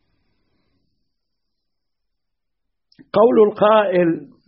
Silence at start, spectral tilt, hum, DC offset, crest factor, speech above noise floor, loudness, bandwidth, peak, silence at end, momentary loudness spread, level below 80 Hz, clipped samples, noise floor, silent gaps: 3.15 s; -5 dB/octave; none; under 0.1%; 18 dB; 65 dB; -15 LUFS; 5.4 kHz; -2 dBFS; 0.25 s; 7 LU; -64 dBFS; under 0.1%; -80 dBFS; none